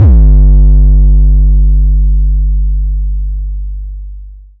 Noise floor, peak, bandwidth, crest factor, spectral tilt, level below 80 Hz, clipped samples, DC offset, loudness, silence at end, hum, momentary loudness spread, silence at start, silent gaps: -28 dBFS; 0 dBFS; 1.1 kHz; 6 dB; -13.5 dB/octave; -6 dBFS; under 0.1%; under 0.1%; -10 LUFS; 0.2 s; 50 Hz at -15 dBFS; 16 LU; 0 s; none